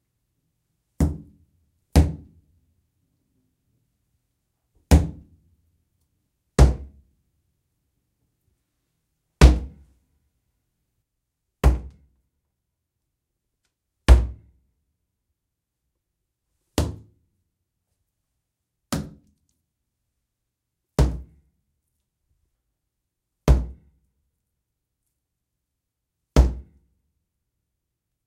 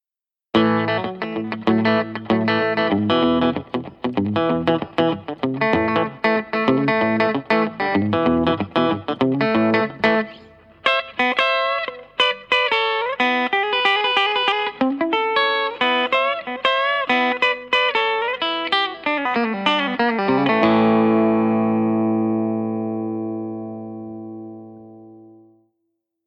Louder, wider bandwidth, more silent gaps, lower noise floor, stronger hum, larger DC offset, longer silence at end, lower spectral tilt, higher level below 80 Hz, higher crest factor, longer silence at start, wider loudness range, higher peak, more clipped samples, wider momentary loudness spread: second, -22 LUFS vs -19 LUFS; first, 15 kHz vs 8.4 kHz; neither; second, -82 dBFS vs under -90 dBFS; second, none vs 50 Hz at -55 dBFS; neither; first, 1.65 s vs 1 s; about the same, -6.5 dB/octave vs -6.5 dB/octave; first, -28 dBFS vs -58 dBFS; first, 26 dB vs 18 dB; first, 1 s vs 0.55 s; first, 11 LU vs 3 LU; about the same, 0 dBFS vs -2 dBFS; neither; first, 19 LU vs 9 LU